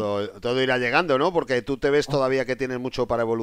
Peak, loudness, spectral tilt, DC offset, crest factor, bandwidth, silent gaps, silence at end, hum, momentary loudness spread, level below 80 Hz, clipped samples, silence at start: -8 dBFS; -23 LUFS; -5.5 dB/octave; under 0.1%; 16 dB; 14 kHz; none; 0 s; none; 7 LU; -50 dBFS; under 0.1%; 0 s